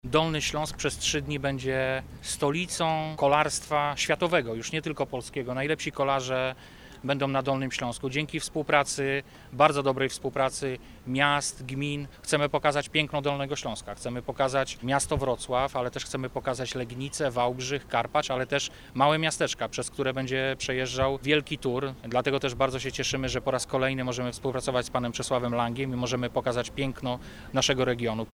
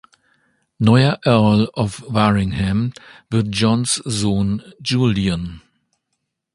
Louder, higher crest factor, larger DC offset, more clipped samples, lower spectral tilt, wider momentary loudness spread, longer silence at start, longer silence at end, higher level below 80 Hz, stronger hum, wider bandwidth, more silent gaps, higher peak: second, -28 LUFS vs -18 LUFS; first, 24 dB vs 18 dB; neither; neither; second, -4 dB/octave vs -5.5 dB/octave; about the same, 8 LU vs 9 LU; second, 0.05 s vs 0.8 s; second, 0.05 s vs 0.95 s; second, -50 dBFS vs -40 dBFS; neither; first, 17 kHz vs 11.5 kHz; neither; second, -4 dBFS vs 0 dBFS